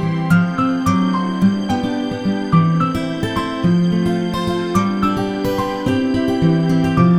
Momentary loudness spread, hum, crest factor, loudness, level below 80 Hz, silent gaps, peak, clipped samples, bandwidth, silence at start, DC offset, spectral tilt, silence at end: 5 LU; none; 16 dB; -17 LUFS; -42 dBFS; none; 0 dBFS; under 0.1%; 13.5 kHz; 0 s; under 0.1%; -7.5 dB/octave; 0 s